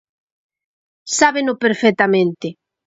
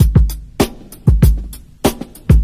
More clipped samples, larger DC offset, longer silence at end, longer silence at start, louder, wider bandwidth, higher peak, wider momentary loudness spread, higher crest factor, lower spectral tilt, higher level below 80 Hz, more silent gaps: neither; neither; first, 0.35 s vs 0 s; first, 1.05 s vs 0 s; about the same, -16 LUFS vs -16 LUFS; second, 8 kHz vs 15.5 kHz; about the same, 0 dBFS vs -2 dBFS; about the same, 11 LU vs 11 LU; first, 18 dB vs 12 dB; second, -3.5 dB/octave vs -6.5 dB/octave; second, -62 dBFS vs -16 dBFS; neither